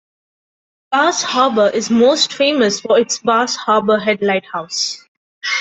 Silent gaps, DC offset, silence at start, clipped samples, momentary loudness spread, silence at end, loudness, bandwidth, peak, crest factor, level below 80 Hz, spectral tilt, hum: 5.08-5.41 s; under 0.1%; 0.9 s; under 0.1%; 7 LU; 0 s; -15 LUFS; 8.4 kHz; -2 dBFS; 14 dB; -62 dBFS; -2.5 dB/octave; none